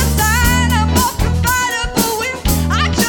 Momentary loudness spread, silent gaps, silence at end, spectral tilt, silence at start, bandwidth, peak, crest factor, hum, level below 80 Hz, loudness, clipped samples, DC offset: 4 LU; none; 0 s; -4 dB/octave; 0 s; over 20 kHz; -2 dBFS; 12 dB; none; -20 dBFS; -15 LUFS; under 0.1%; under 0.1%